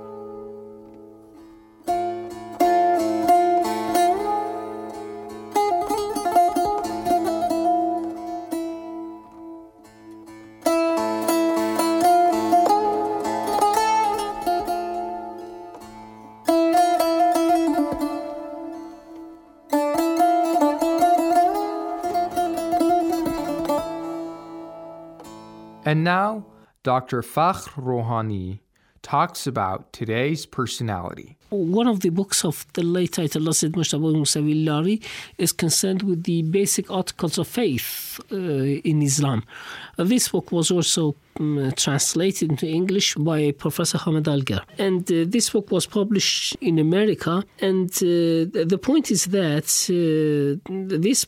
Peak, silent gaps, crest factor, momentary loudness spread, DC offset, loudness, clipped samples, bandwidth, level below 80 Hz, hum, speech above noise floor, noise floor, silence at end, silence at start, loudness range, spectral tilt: -6 dBFS; none; 16 dB; 16 LU; under 0.1%; -22 LUFS; under 0.1%; 18 kHz; -56 dBFS; none; 25 dB; -47 dBFS; 0 s; 0 s; 5 LU; -4.5 dB/octave